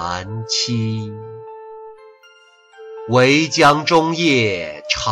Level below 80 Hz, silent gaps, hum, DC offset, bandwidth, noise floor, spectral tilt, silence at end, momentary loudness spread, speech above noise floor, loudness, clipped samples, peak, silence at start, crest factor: -50 dBFS; none; none; under 0.1%; 14 kHz; -49 dBFS; -4 dB/octave; 0 s; 23 LU; 32 dB; -16 LUFS; under 0.1%; -2 dBFS; 0 s; 16 dB